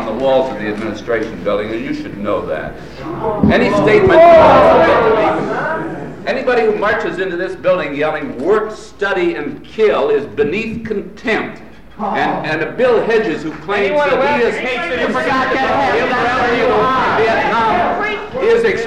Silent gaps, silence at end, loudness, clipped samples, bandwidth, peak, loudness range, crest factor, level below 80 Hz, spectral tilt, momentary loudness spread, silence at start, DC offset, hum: none; 0 s; -14 LUFS; under 0.1%; 11 kHz; 0 dBFS; 7 LU; 14 dB; -40 dBFS; -6 dB/octave; 12 LU; 0 s; 1%; none